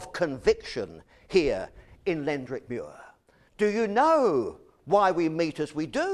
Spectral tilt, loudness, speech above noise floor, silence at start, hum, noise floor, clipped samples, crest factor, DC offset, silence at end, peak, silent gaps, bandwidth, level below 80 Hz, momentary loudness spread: -5.5 dB/octave; -27 LUFS; 33 dB; 0 s; none; -59 dBFS; under 0.1%; 18 dB; under 0.1%; 0 s; -10 dBFS; none; 11.5 kHz; -54 dBFS; 14 LU